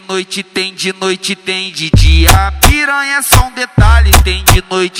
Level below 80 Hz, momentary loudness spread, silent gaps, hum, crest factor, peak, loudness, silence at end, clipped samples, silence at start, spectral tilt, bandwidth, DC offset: -14 dBFS; 9 LU; none; none; 10 dB; 0 dBFS; -10 LUFS; 0 s; 3%; 0.1 s; -3.5 dB/octave; over 20 kHz; under 0.1%